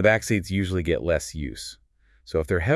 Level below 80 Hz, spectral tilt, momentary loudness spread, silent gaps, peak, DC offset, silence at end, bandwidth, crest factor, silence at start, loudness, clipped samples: -42 dBFS; -5.5 dB/octave; 11 LU; none; -6 dBFS; under 0.1%; 0 s; 12 kHz; 18 dB; 0 s; -25 LUFS; under 0.1%